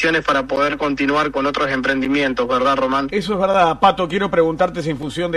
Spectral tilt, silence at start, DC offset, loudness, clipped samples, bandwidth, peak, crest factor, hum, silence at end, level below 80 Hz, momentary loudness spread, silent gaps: -5.5 dB/octave; 0 s; under 0.1%; -18 LUFS; under 0.1%; 12 kHz; 0 dBFS; 18 dB; none; 0 s; -44 dBFS; 5 LU; none